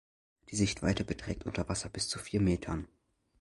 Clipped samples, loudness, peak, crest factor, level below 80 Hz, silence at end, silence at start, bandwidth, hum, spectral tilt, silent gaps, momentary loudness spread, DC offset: under 0.1%; -34 LUFS; -14 dBFS; 20 dB; -48 dBFS; 0.55 s; 0.5 s; 11.5 kHz; none; -5 dB/octave; none; 9 LU; under 0.1%